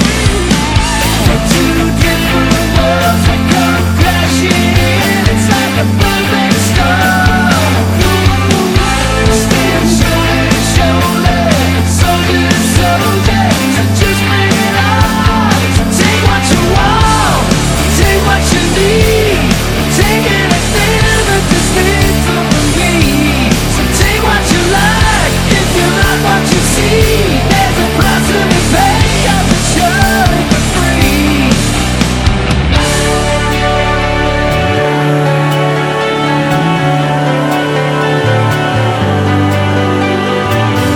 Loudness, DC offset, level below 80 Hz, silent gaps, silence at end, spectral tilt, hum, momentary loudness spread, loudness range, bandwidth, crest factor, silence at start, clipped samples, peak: -10 LUFS; under 0.1%; -20 dBFS; none; 0 s; -4.5 dB/octave; none; 3 LU; 2 LU; 19.5 kHz; 10 dB; 0 s; 0.4%; 0 dBFS